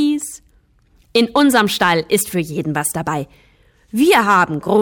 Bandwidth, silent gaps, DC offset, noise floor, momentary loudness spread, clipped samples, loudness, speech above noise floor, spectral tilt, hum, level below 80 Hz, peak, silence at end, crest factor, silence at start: 18 kHz; none; under 0.1%; -54 dBFS; 11 LU; under 0.1%; -16 LUFS; 39 dB; -4 dB/octave; none; -52 dBFS; -2 dBFS; 0 s; 14 dB; 0 s